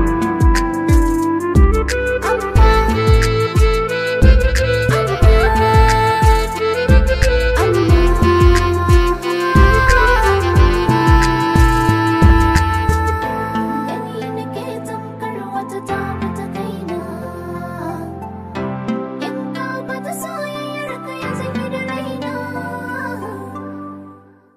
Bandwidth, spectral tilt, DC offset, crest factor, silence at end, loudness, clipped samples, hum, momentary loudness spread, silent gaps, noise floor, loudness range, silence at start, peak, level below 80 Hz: 15 kHz; -6 dB/octave; under 0.1%; 14 dB; 0.4 s; -16 LUFS; under 0.1%; none; 14 LU; none; -42 dBFS; 12 LU; 0 s; 0 dBFS; -18 dBFS